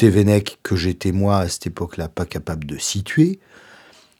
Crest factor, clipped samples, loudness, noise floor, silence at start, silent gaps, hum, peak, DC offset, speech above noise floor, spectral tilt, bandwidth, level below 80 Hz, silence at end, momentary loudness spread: 18 dB; under 0.1%; -20 LUFS; -48 dBFS; 0 s; none; none; -2 dBFS; under 0.1%; 29 dB; -6 dB/octave; 16.5 kHz; -42 dBFS; 0.85 s; 11 LU